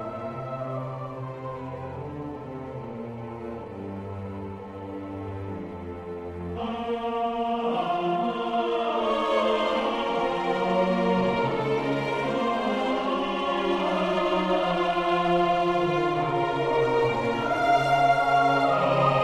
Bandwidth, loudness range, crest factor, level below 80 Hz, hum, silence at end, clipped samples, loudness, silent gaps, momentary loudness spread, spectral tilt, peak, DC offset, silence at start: 12 kHz; 13 LU; 16 dB; -54 dBFS; none; 0 s; under 0.1%; -26 LUFS; none; 15 LU; -6.5 dB/octave; -10 dBFS; under 0.1%; 0 s